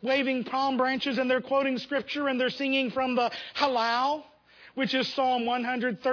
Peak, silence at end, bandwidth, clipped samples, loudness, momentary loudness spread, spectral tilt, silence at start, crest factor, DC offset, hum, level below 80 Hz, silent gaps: -12 dBFS; 0 s; 5.4 kHz; under 0.1%; -27 LUFS; 4 LU; -4.5 dB/octave; 0 s; 14 dB; under 0.1%; none; -72 dBFS; none